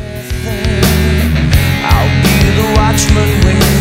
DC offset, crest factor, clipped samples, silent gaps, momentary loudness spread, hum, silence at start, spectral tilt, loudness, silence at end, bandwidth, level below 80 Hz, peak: under 0.1%; 10 dB; under 0.1%; none; 7 LU; none; 0 s; -5 dB/octave; -11 LUFS; 0 s; 16.5 kHz; -16 dBFS; 0 dBFS